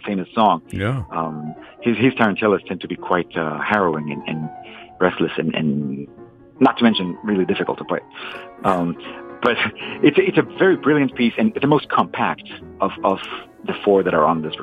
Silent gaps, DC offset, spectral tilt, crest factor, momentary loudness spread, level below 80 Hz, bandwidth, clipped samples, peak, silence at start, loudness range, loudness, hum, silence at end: none; under 0.1%; -7.5 dB/octave; 18 dB; 14 LU; -54 dBFS; 9.8 kHz; under 0.1%; -2 dBFS; 0.05 s; 4 LU; -19 LUFS; none; 0 s